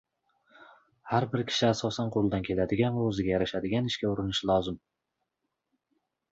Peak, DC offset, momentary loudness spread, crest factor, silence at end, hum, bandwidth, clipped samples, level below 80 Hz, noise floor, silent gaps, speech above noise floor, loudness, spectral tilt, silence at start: -10 dBFS; under 0.1%; 3 LU; 20 dB; 1.55 s; none; 8 kHz; under 0.1%; -54 dBFS; -83 dBFS; none; 55 dB; -29 LUFS; -6 dB/octave; 0.6 s